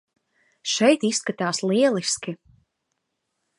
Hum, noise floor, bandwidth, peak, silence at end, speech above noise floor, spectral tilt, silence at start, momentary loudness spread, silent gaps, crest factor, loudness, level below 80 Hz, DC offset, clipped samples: none; -78 dBFS; 11.5 kHz; -6 dBFS; 1.25 s; 56 dB; -3.5 dB/octave; 0.65 s; 14 LU; none; 20 dB; -22 LUFS; -70 dBFS; under 0.1%; under 0.1%